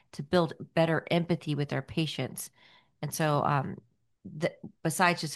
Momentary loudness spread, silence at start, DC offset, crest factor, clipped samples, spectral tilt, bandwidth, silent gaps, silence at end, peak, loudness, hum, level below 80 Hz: 14 LU; 0.15 s; under 0.1%; 22 dB; under 0.1%; -5 dB/octave; 12.5 kHz; none; 0 s; -10 dBFS; -30 LUFS; none; -64 dBFS